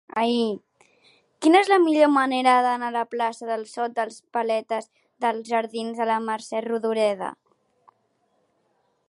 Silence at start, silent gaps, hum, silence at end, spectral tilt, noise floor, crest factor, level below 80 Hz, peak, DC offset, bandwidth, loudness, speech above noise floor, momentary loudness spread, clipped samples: 0.15 s; none; none; 1.75 s; -4 dB/octave; -69 dBFS; 20 dB; -80 dBFS; -4 dBFS; under 0.1%; 11.5 kHz; -23 LUFS; 47 dB; 12 LU; under 0.1%